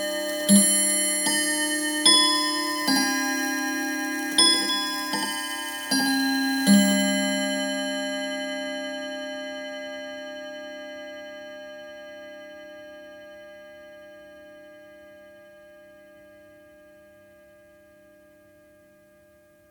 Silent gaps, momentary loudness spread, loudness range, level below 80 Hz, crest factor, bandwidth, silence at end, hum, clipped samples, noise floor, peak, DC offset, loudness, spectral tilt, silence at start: none; 24 LU; 22 LU; -72 dBFS; 24 dB; 19.5 kHz; 3.85 s; none; under 0.1%; -56 dBFS; -4 dBFS; under 0.1%; -22 LUFS; -2 dB/octave; 0 s